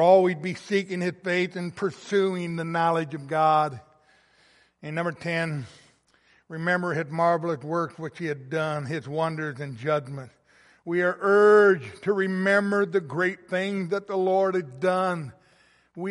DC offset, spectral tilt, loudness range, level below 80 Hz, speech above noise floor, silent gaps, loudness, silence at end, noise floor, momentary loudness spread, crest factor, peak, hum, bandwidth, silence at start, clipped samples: under 0.1%; -6.5 dB/octave; 8 LU; -72 dBFS; 38 dB; none; -25 LUFS; 0 s; -63 dBFS; 12 LU; 18 dB; -6 dBFS; none; 11.5 kHz; 0 s; under 0.1%